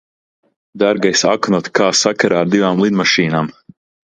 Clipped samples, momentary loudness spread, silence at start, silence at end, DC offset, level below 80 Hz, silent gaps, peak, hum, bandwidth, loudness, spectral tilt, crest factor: under 0.1%; 5 LU; 0.75 s; 0.6 s; under 0.1%; -56 dBFS; none; 0 dBFS; none; 9.4 kHz; -14 LUFS; -4 dB/octave; 16 dB